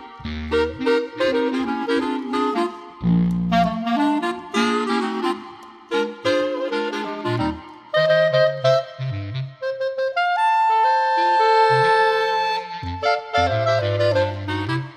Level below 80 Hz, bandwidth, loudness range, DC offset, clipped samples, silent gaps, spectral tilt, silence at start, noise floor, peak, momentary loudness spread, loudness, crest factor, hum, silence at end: -48 dBFS; 12.5 kHz; 5 LU; under 0.1%; under 0.1%; none; -6 dB/octave; 0 s; -40 dBFS; -4 dBFS; 10 LU; -20 LUFS; 16 dB; none; 0 s